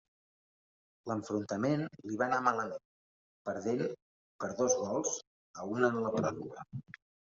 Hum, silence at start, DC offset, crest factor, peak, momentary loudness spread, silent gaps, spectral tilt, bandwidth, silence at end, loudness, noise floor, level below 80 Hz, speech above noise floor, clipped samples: none; 1.05 s; under 0.1%; 24 dB; -12 dBFS; 16 LU; 2.85-3.45 s, 4.02-4.39 s, 5.27-5.54 s; -5.5 dB/octave; 7.6 kHz; 0.4 s; -34 LUFS; under -90 dBFS; -76 dBFS; over 56 dB; under 0.1%